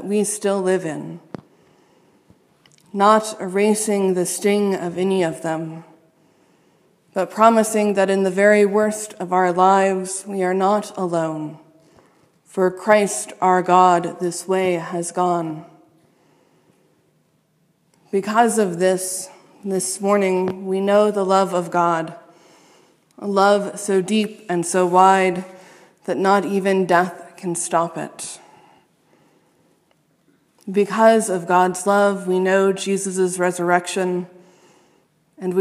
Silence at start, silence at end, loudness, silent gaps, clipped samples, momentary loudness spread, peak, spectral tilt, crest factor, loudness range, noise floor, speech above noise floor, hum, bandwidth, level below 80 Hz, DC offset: 0 s; 0 s; -19 LUFS; none; under 0.1%; 15 LU; 0 dBFS; -4.5 dB/octave; 20 dB; 6 LU; -63 dBFS; 45 dB; none; 15.5 kHz; -74 dBFS; under 0.1%